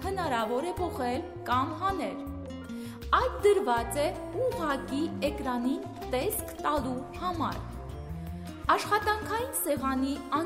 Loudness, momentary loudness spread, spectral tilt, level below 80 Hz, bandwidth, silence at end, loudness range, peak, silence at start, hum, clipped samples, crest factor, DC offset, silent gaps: -30 LUFS; 14 LU; -4.5 dB/octave; -46 dBFS; 16 kHz; 0 s; 3 LU; -12 dBFS; 0 s; none; under 0.1%; 18 dB; under 0.1%; none